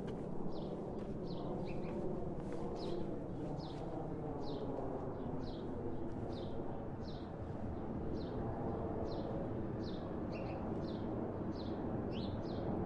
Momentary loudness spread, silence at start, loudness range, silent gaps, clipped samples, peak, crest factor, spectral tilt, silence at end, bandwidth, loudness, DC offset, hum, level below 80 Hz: 3 LU; 0 s; 2 LU; none; under 0.1%; -28 dBFS; 14 dB; -9 dB/octave; 0 s; 9.4 kHz; -43 LUFS; under 0.1%; none; -54 dBFS